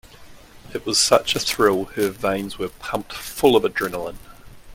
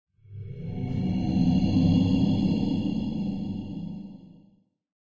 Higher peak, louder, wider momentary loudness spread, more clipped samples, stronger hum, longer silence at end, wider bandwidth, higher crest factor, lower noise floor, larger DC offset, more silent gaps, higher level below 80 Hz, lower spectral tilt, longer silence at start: first, 0 dBFS vs -10 dBFS; first, -21 LUFS vs -26 LUFS; second, 14 LU vs 19 LU; neither; neither; second, 0 s vs 0.75 s; first, 17 kHz vs 7 kHz; first, 22 dB vs 16 dB; second, -44 dBFS vs -62 dBFS; neither; neither; about the same, -48 dBFS vs -44 dBFS; second, -3 dB/octave vs -8.5 dB/octave; about the same, 0.2 s vs 0.3 s